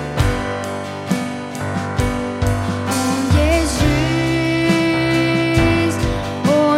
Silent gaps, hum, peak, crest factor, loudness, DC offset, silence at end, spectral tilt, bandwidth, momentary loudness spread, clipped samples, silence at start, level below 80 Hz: none; none; -2 dBFS; 16 dB; -18 LUFS; under 0.1%; 0 s; -5.5 dB/octave; 16 kHz; 8 LU; under 0.1%; 0 s; -28 dBFS